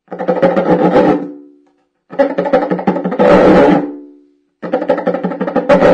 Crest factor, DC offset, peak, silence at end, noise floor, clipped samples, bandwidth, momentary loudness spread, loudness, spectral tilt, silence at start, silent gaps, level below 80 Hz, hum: 12 dB; under 0.1%; 0 dBFS; 0 s; -56 dBFS; under 0.1%; 8.6 kHz; 14 LU; -12 LUFS; -8 dB/octave; 0.1 s; none; -42 dBFS; none